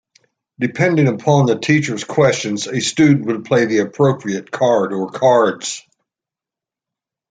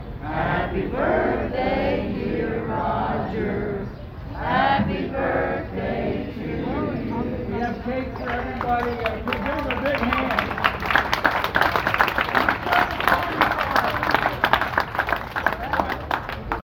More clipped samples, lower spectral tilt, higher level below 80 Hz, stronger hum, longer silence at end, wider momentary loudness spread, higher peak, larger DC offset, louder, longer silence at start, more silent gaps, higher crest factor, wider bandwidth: neither; about the same, -5.5 dB/octave vs -6 dB/octave; second, -58 dBFS vs -38 dBFS; neither; first, 1.5 s vs 0.05 s; about the same, 9 LU vs 7 LU; about the same, -2 dBFS vs 0 dBFS; neither; first, -16 LUFS vs -23 LUFS; first, 0.6 s vs 0 s; neither; second, 16 dB vs 24 dB; second, 9.4 kHz vs 19 kHz